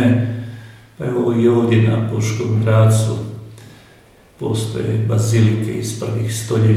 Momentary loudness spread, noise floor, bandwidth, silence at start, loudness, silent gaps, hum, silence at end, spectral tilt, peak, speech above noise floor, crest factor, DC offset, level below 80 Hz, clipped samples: 14 LU; -47 dBFS; 13.5 kHz; 0 s; -17 LUFS; none; none; 0 s; -7 dB/octave; -2 dBFS; 32 dB; 16 dB; under 0.1%; -50 dBFS; under 0.1%